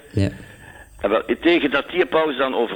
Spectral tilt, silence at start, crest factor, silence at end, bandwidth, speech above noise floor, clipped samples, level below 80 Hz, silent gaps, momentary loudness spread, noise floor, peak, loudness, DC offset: -6.5 dB/octave; 0.15 s; 16 dB; 0 s; 19 kHz; 23 dB; under 0.1%; -48 dBFS; none; 8 LU; -43 dBFS; -4 dBFS; -20 LUFS; under 0.1%